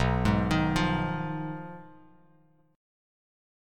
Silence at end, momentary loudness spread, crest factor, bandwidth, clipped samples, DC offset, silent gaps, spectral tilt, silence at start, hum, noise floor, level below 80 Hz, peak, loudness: 1.85 s; 16 LU; 20 dB; 13.5 kHz; under 0.1%; under 0.1%; none; -6.5 dB/octave; 0 s; none; -63 dBFS; -42 dBFS; -12 dBFS; -28 LUFS